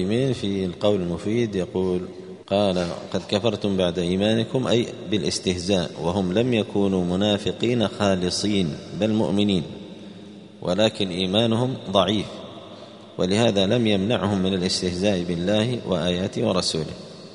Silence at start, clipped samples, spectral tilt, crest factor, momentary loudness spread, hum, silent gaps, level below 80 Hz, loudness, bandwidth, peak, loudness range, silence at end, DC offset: 0 s; under 0.1%; -5.5 dB/octave; 20 dB; 13 LU; none; none; -54 dBFS; -23 LUFS; 11 kHz; -4 dBFS; 2 LU; 0 s; under 0.1%